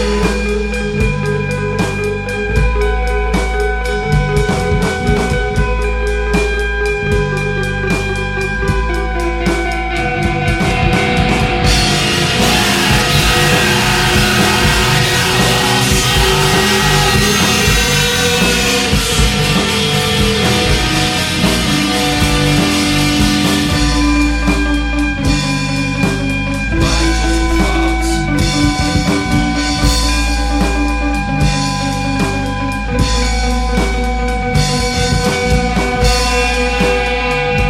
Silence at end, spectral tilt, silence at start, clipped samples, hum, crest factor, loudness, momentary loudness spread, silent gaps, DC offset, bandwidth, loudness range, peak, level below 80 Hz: 0 s; -4 dB/octave; 0 s; under 0.1%; none; 14 dB; -13 LUFS; 6 LU; none; under 0.1%; 16.5 kHz; 5 LU; 0 dBFS; -20 dBFS